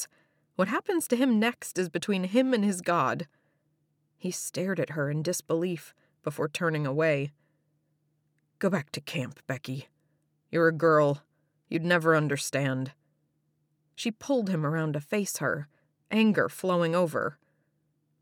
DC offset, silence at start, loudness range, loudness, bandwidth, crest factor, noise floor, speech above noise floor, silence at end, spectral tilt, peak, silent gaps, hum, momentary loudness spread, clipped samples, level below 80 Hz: under 0.1%; 0 s; 5 LU; -28 LUFS; 17.5 kHz; 18 dB; -74 dBFS; 47 dB; 0.9 s; -5.5 dB/octave; -10 dBFS; none; none; 12 LU; under 0.1%; -78 dBFS